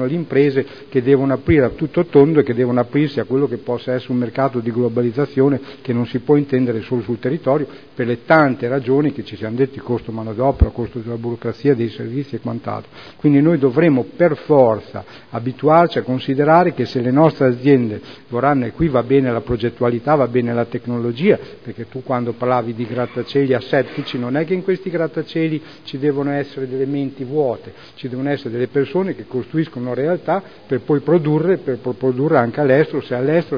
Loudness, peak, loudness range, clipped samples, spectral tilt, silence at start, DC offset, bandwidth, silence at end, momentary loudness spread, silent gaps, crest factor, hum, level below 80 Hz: -18 LUFS; 0 dBFS; 6 LU; under 0.1%; -9.5 dB/octave; 0 s; 0.4%; 5.4 kHz; 0 s; 11 LU; none; 18 dB; none; -38 dBFS